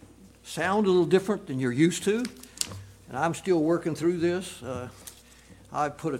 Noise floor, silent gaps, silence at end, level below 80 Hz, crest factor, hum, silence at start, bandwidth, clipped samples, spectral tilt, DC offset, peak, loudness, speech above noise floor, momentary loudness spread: -52 dBFS; none; 0 s; -60 dBFS; 26 dB; none; 0.2 s; 16.5 kHz; under 0.1%; -5.5 dB/octave; under 0.1%; -2 dBFS; -27 LUFS; 26 dB; 15 LU